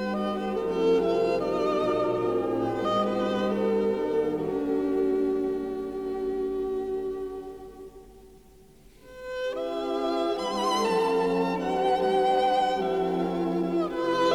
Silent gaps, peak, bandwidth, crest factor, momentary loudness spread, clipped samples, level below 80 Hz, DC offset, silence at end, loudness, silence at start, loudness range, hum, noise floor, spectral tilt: none; -12 dBFS; 14 kHz; 14 dB; 9 LU; under 0.1%; -54 dBFS; under 0.1%; 0 s; -27 LUFS; 0 s; 9 LU; none; -53 dBFS; -6 dB/octave